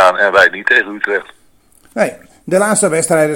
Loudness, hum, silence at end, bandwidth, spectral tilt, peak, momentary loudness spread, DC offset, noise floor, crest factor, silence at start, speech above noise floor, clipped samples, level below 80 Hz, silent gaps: -13 LUFS; none; 0 s; 17.5 kHz; -3 dB/octave; 0 dBFS; 10 LU; under 0.1%; -49 dBFS; 14 dB; 0 s; 36 dB; 0.4%; -56 dBFS; none